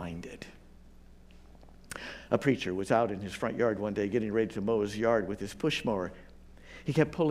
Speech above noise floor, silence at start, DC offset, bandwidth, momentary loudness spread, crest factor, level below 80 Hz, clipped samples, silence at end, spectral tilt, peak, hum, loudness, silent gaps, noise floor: 23 dB; 0 s; under 0.1%; 15.5 kHz; 14 LU; 22 dB; -56 dBFS; under 0.1%; 0 s; -6 dB/octave; -10 dBFS; none; -31 LUFS; none; -53 dBFS